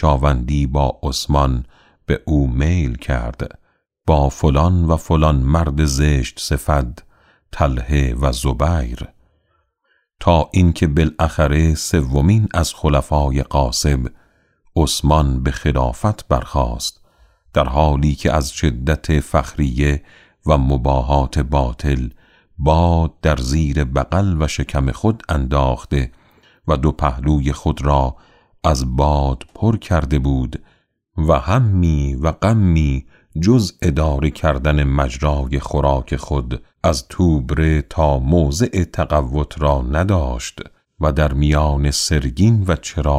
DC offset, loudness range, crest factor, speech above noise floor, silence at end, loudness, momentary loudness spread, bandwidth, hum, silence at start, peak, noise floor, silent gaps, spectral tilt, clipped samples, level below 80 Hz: under 0.1%; 3 LU; 14 dB; 49 dB; 0 s; -18 LUFS; 7 LU; 14.5 kHz; none; 0 s; -2 dBFS; -65 dBFS; none; -6.5 dB/octave; under 0.1%; -22 dBFS